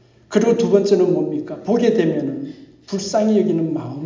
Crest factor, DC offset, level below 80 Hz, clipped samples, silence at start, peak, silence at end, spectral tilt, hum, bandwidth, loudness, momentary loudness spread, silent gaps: 16 dB; under 0.1%; -62 dBFS; under 0.1%; 0.3 s; -2 dBFS; 0 s; -6.5 dB/octave; none; 7.6 kHz; -18 LUFS; 11 LU; none